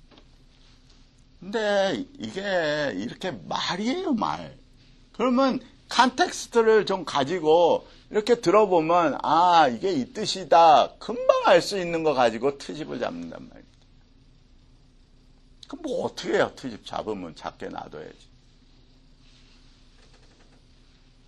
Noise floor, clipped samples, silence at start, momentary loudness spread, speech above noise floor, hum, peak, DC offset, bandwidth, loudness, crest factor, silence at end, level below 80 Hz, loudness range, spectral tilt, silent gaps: -55 dBFS; under 0.1%; 1.4 s; 18 LU; 32 dB; none; -2 dBFS; under 0.1%; 12 kHz; -23 LUFS; 24 dB; 3.15 s; -56 dBFS; 18 LU; -4.5 dB/octave; none